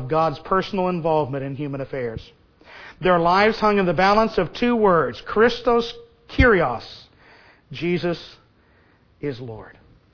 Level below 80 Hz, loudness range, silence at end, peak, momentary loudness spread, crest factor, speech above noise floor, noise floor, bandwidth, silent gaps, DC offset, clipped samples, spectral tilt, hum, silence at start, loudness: -38 dBFS; 6 LU; 0.45 s; -2 dBFS; 17 LU; 18 dB; 36 dB; -57 dBFS; 5.4 kHz; none; under 0.1%; under 0.1%; -7 dB/octave; none; 0 s; -20 LUFS